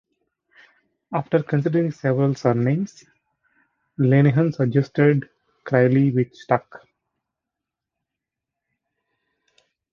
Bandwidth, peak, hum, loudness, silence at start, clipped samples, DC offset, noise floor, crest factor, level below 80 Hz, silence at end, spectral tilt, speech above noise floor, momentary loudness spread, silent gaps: 7 kHz; -2 dBFS; none; -20 LUFS; 1.1 s; under 0.1%; under 0.1%; -85 dBFS; 20 dB; -62 dBFS; 3.15 s; -9 dB/octave; 66 dB; 9 LU; none